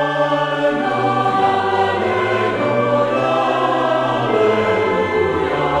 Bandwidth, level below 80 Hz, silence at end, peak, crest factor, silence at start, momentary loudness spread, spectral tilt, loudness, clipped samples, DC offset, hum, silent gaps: 11.5 kHz; -50 dBFS; 0 s; -4 dBFS; 12 dB; 0 s; 2 LU; -6 dB/octave; -17 LUFS; under 0.1%; under 0.1%; none; none